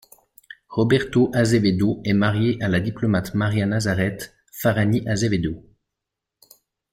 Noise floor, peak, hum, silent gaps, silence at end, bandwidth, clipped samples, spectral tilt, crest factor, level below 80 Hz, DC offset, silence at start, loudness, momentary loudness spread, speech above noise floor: -84 dBFS; -6 dBFS; none; none; 1.35 s; 16.5 kHz; under 0.1%; -6.5 dB/octave; 16 dB; -50 dBFS; under 0.1%; 0.7 s; -21 LUFS; 8 LU; 64 dB